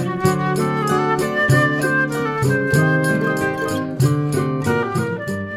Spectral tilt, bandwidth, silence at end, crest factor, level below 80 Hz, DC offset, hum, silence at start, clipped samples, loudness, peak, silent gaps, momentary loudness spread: -6 dB/octave; 16 kHz; 0 s; 16 dB; -48 dBFS; under 0.1%; none; 0 s; under 0.1%; -18 LUFS; -2 dBFS; none; 6 LU